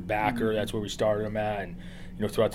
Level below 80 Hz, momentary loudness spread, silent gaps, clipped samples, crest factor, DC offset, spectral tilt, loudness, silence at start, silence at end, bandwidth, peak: -46 dBFS; 12 LU; none; under 0.1%; 18 dB; under 0.1%; -5.5 dB/octave; -29 LUFS; 0 s; 0 s; 16 kHz; -10 dBFS